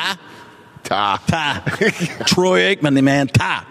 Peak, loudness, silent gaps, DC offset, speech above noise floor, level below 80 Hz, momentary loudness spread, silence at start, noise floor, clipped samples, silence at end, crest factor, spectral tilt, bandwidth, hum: -2 dBFS; -17 LUFS; none; under 0.1%; 25 dB; -50 dBFS; 9 LU; 0 s; -41 dBFS; under 0.1%; 0.05 s; 14 dB; -4.5 dB/octave; 15 kHz; none